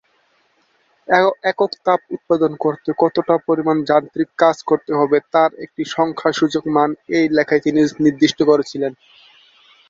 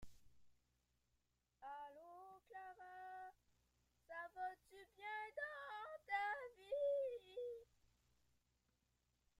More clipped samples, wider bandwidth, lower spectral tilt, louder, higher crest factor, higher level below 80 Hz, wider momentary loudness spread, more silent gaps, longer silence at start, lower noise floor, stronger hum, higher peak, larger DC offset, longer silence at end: neither; second, 7.6 kHz vs 15 kHz; first, -5.5 dB/octave vs -3.5 dB/octave; first, -17 LUFS vs -49 LUFS; about the same, 16 dB vs 20 dB; first, -62 dBFS vs -80 dBFS; second, 5 LU vs 17 LU; neither; first, 1.1 s vs 0 s; second, -61 dBFS vs -87 dBFS; second, none vs 60 Hz at -95 dBFS; first, 0 dBFS vs -32 dBFS; neither; second, 0.95 s vs 1.75 s